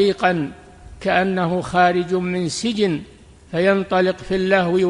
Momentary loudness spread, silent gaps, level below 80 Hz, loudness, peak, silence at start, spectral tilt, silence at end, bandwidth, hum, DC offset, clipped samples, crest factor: 8 LU; none; -48 dBFS; -19 LUFS; -2 dBFS; 0 s; -5.5 dB/octave; 0 s; 11 kHz; none; under 0.1%; under 0.1%; 16 dB